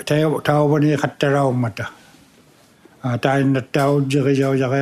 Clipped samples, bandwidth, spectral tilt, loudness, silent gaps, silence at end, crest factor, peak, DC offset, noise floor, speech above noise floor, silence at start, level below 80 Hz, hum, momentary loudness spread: under 0.1%; 14.5 kHz; -7 dB/octave; -18 LUFS; none; 0 s; 18 dB; -2 dBFS; under 0.1%; -51 dBFS; 34 dB; 0 s; -60 dBFS; none; 9 LU